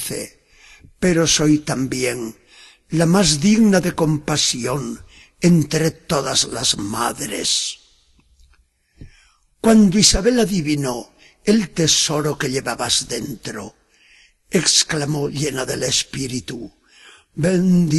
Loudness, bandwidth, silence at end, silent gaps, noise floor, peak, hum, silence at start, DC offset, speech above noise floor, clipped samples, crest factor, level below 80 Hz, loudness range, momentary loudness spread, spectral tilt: -18 LUFS; 12.5 kHz; 0 s; none; -58 dBFS; 0 dBFS; none; 0 s; under 0.1%; 40 dB; under 0.1%; 18 dB; -42 dBFS; 4 LU; 15 LU; -4 dB/octave